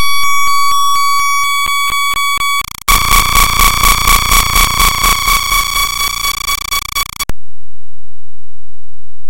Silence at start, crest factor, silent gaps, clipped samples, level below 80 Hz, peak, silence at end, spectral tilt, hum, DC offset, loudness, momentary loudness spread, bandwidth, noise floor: 0 s; 10 dB; none; under 0.1%; -22 dBFS; 0 dBFS; 0 s; -0.5 dB/octave; none; under 0.1%; -11 LUFS; 7 LU; over 20 kHz; -47 dBFS